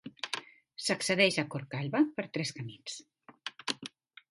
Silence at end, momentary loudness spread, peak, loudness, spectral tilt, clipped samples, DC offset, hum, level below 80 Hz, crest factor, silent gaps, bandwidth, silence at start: 0.45 s; 18 LU; -10 dBFS; -32 LUFS; -4 dB/octave; under 0.1%; under 0.1%; none; -76 dBFS; 24 dB; none; 11.5 kHz; 0.05 s